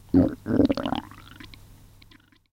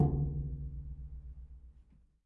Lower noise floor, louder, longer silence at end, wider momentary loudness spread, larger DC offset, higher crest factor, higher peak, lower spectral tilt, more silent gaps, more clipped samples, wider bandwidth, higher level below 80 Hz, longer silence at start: second, -55 dBFS vs -62 dBFS; first, -24 LUFS vs -39 LUFS; first, 1.05 s vs 0.45 s; about the same, 23 LU vs 21 LU; neither; about the same, 20 dB vs 20 dB; first, -6 dBFS vs -18 dBFS; second, -8 dB/octave vs -14 dB/octave; neither; neither; first, 9.6 kHz vs 1.3 kHz; about the same, -46 dBFS vs -44 dBFS; first, 0.15 s vs 0 s